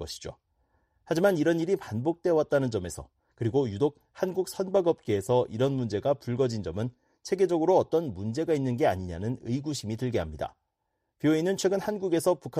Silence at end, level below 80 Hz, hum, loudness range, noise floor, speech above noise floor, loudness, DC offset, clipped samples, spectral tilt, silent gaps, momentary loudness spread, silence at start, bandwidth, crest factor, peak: 0 s; -56 dBFS; none; 2 LU; -80 dBFS; 53 dB; -28 LUFS; under 0.1%; under 0.1%; -6.5 dB/octave; none; 9 LU; 0 s; 15 kHz; 18 dB; -10 dBFS